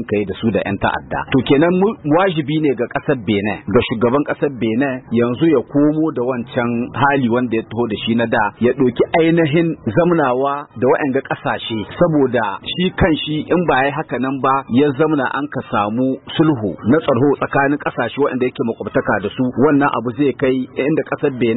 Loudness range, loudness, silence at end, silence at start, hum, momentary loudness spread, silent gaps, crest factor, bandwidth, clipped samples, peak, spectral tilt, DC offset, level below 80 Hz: 1 LU; -17 LUFS; 0 s; 0 s; none; 6 LU; none; 14 dB; 4.1 kHz; under 0.1%; -2 dBFS; -12 dB/octave; under 0.1%; -44 dBFS